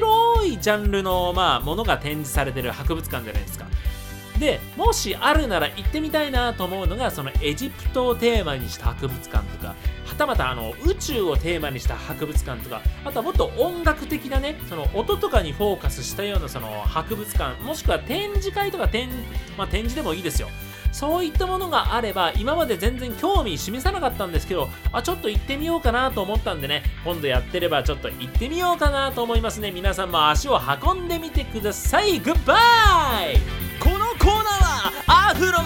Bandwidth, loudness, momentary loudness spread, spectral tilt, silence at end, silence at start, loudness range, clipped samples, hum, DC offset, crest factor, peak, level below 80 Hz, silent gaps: 17 kHz; -23 LUFS; 9 LU; -4.5 dB/octave; 0 s; 0 s; 7 LU; under 0.1%; none; under 0.1%; 20 dB; -2 dBFS; -28 dBFS; none